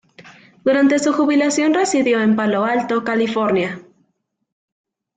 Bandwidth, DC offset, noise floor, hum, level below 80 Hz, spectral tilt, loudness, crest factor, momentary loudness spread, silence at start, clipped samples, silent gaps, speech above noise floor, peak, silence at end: 9.4 kHz; under 0.1%; -70 dBFS; none; -64 dBFS; -4.5 dB/octave; -17 LUFS; 14 dB; 5 LU; 0.2 s; under 0.1%; none; 53 dB; -6 dBFS; 1.35 s